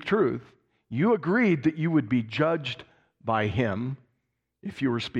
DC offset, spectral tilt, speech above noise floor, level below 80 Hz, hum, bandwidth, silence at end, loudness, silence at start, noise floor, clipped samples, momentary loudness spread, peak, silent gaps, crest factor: under 0.1%; -7.5 dB/octave; 53 dB; -60 dBFS; none; 8.6 kHz; 0 s; -26 LUFS; 0 s; -78 dBFS; under 0.1%; 15 LU; -10 dBFS; none; 16 dB